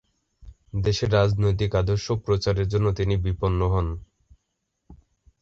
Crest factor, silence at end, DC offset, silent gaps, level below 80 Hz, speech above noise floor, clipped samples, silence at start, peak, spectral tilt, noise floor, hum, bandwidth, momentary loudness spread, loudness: 18 dB; 0.45 s; under 0.1%; none; -36 dBFS; 55 dB; under 0.1%; 0.45 s; -8 dBFS; -7 dB/octave; -78 dBFS; none; 7.4 kHz; 6 LU; -24 LUFS